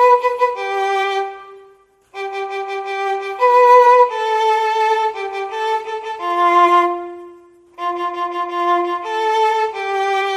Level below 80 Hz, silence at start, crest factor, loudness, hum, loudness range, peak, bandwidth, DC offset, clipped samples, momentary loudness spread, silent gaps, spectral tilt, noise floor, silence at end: -68 dBFS; 0 s; 16 dB; -16 LUFS; none; 5 LU; 0 dBFS; 13.5 kHz; under 0.1%; under 0.1%; 14 LU; none; -2 dB/octave; -50 dBFS; 0 s